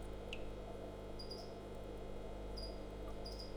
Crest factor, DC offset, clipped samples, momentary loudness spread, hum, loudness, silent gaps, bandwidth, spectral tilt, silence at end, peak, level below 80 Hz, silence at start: 16 dB; under 0.1%; under 0.1%; 2 LU; 50 Hz at -55 dBFS; -49 LUFS; none; over 20 kHz; -5.5 dB/octave; 0 s; -32 dBFS; -52 dBFS; 0 s